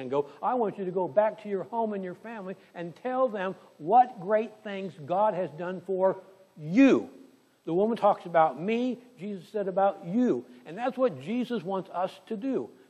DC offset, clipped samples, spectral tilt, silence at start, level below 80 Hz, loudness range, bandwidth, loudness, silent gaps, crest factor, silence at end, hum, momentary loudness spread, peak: under 0.1%; under 0.1%; -7.5 dB/octave; 0 s; -82 dBFS; 4 LU; 8.6 kHz; -28 LUFS; none; 18 dB; 0.25 s; none; 16 LU; -10 dBFS